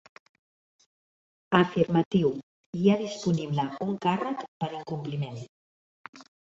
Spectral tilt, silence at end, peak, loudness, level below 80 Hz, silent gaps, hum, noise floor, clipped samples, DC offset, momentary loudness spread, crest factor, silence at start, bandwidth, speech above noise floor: -7 dB/octave; 0.35 s; -4 dBFS; -28 LUFS; -64 dBFS; 2.06-2.11 s, 2.43-2.73 s, 4.48-4.60 s, 5.49-6.13 s; none; under -90 dBFS; under 0.1%; under 0.1%; 18 LU; 24 dB; 1.5 s; 7.8 kHz; over 63 dB